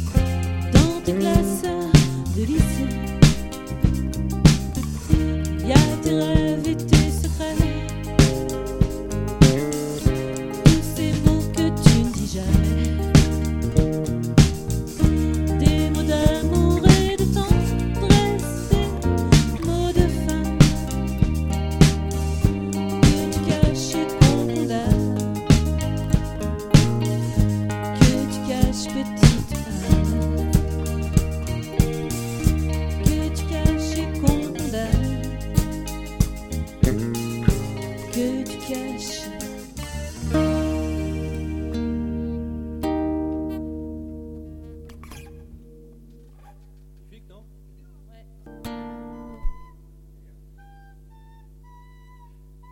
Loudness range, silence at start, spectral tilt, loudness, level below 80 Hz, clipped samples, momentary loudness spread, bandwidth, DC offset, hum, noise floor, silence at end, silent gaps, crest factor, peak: 10 LU; 0 s; -6 dB/octave; -21 LUFS; -28 dBFS; under 0.1%; 13 LU; 17.5 kHz; under 0.1%; 50 Hz at -40 dBFS; -46 dBFS; 3.05 s; none; 20 dB; 0 dBFS